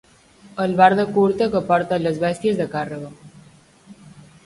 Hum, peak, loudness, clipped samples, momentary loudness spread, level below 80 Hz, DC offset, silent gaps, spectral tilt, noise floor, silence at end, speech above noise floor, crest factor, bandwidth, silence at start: none; 0 dBFS; -19 LUFS; under 0.1%; 16 LU; -56 dBFS; under 0.1%; none; -7 dB/octave; -50 dBFS; 0.35 s; 31 dB; 20 dB; 11.5 kHz; 0.55 s